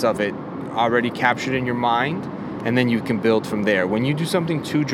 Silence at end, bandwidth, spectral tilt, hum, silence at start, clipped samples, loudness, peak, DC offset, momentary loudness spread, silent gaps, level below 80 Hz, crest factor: 0 s; 15 kHz; -6 dB/octave; none; 0 s; under 0.1%; -21 LUFS; -2 dBFS; under 0.1%; 7 LU; none; -56 dBFS; 18 dB